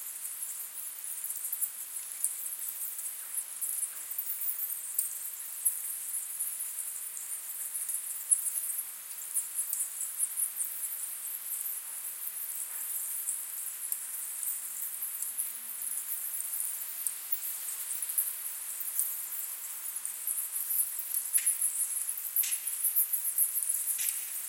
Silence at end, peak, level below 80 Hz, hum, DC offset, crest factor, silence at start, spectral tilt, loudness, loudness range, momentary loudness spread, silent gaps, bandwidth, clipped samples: 0 s; -10 dBFS; under -90 dBFS; none; under 0.1%; 26 dB; 0 s; 4 dB/octave; -32 LUFS; 5 LU; 9 LU; none; 17 kHz; under 0.1%